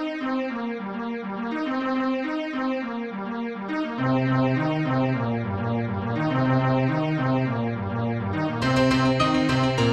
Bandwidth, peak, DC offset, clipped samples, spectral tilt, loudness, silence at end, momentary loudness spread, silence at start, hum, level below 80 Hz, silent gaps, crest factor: 9.4 kHz; -8 dBFS; under 0.1%; under 0.1%; -7 dB/octave; -25 LUFS; 0 s; 9 LU; 0 s; none; -50 dBFS; none; 16 dB